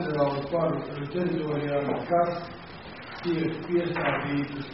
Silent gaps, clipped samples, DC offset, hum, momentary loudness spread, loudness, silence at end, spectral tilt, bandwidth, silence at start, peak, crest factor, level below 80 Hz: none; under 0.1%; 0.1%; none; 13 LU; -28 LUFS; 0 s; -5.5 dB/octave; 5.8 kHz; 0 s; -12 dBFS; 16 dB; -58 dBFS